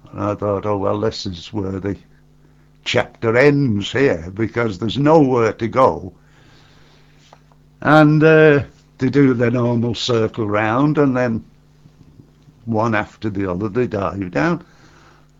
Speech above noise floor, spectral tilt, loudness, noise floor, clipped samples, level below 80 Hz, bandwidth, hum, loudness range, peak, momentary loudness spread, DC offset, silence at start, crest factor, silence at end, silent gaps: 34 dB; -7 dB/octave; -17 LUFS; -50 dBFS; under 0.1%; -48 dBFS; 7.8 kHz; none; 7 LU; 0 dBFS; 14 LU; under 0.1%; 0.15 s; 18 dB; 0.8 s; none